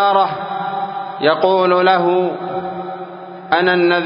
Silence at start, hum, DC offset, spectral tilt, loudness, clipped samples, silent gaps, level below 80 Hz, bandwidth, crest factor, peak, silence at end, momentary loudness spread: 0 s; none; under 0.1%; -9.5 dB/octave; -16 LUFS; under 0.1%; none; -64 dBFS; 5.4 kHz; 16 dB; 0 dBFS; 0 s; 15 LU